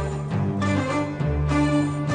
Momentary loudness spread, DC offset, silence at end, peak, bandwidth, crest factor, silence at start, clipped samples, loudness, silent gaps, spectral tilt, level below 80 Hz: 5 LU; under 0.1%; 0 s; -10 dBFS; 10 kHz; 14 dB; 0 s; under 0.1%; -23 LUFS; none; -7 dB/octave; -34 dBFS